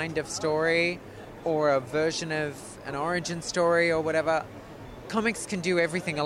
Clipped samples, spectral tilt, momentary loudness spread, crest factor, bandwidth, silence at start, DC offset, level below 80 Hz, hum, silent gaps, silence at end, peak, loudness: under 0.1%; -4.5 dB/octave; 15 LU; 16 dB; 15 kHz; 0 s; under 0.1%; -56 dBFS; none; none; 0 s; -10 dBFS; -27 LUFS